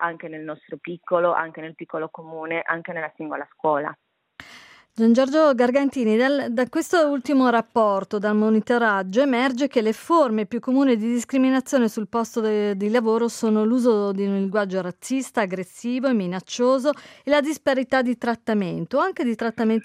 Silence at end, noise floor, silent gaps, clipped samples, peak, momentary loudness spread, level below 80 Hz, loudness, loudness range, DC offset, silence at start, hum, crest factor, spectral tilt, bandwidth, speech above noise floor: 0 s; -48 dBFS; none; under 0.1%; -6 dBFS; 12 LU; -70 dBFS; -22 LUFS; 7 LU; under 0.1%; 0 s; none; 16 dB; -5.5 dB/octave; 15.5 kHz; 26 dB